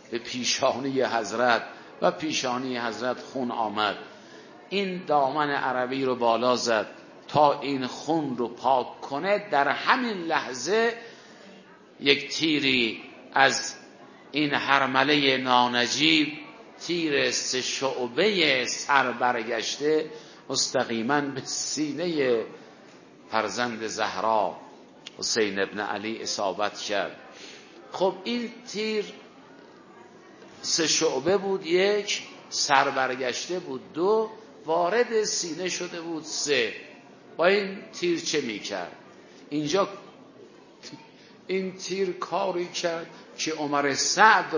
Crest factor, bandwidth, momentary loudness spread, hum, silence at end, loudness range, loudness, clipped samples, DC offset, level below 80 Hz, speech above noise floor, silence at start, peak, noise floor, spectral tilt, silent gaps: 24 dB; 7.4 kHz; 13 LU; none; 0 s; 7 LU; -25 LUFS; under 0.1%; under 0.1%; -72 dBFS; 25 dB; 0.05 s; -2 dBFS; -51 dBFS; -2.5 dB/octave; none